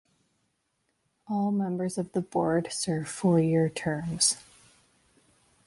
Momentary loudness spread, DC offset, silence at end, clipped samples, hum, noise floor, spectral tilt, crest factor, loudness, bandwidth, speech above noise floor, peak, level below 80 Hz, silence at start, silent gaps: 7 LU; under 0.1%; 1.25 s; under 0.1%; none; -76 dBFS; -4.5 dB/octave; 20 dB; -28 LUFS; 11.5 kHz; 49 dB; -10 dBFS; -62 dBFS; 1.3 s; none